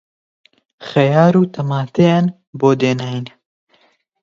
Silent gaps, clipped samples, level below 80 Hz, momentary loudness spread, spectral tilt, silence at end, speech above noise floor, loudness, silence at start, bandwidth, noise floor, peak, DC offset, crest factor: 2.47-2.53 s; under 0.1%; -60 dBFS; 14 LU; -7.5 dB/octave; 0.95 s; 43 dB; -15 LUFS; 0.8 s; 7.4 kHz; -58 dBFS; 0 dBFS; under 0.1%; 16 dB